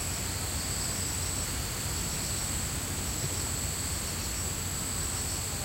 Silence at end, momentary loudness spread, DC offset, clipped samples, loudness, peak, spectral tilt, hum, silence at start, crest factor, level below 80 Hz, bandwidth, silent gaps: 0 s; 1 LU; under 0.1%; under 0.1%; -31 LUFS; -18 dBFS; -2.5 dB/octave; none; 0 s; 14 dB; -42 dBFS; 16 kHz; none